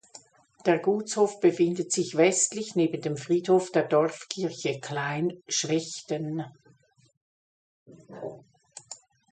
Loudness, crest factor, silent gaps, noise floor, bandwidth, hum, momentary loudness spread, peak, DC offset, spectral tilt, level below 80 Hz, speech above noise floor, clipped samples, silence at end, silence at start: -26 LUFS; 20 dB; 7.17-7.86 s; -62 dBFS; 9.6 kHz; none; 18 LU; -8 dBFS; under 0.1%; -4 dB/octave; -74 dBFS; 35 dB; under 0.1%; 0.35 s; 0.15 s